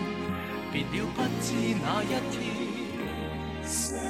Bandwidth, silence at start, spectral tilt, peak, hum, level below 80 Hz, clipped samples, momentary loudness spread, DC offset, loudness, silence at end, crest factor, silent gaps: 16 kHz; 0 s; -4.5 dB/octave; -16 dBFS; none; -48 dBFS; under 0.1%; 6 LU; under 0.1%; -31 LUFS; 0 s; 16 dB; none